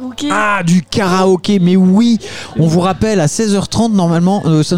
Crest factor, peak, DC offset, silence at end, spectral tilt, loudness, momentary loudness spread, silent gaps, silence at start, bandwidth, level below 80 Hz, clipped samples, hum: 10 dB; 0 dBFS; 1%; 0 s; -6 dB/octave; -12 LUFS; 5 LU; none; 0 s; 13 kHz; -40 dBFS; under 0.1%; none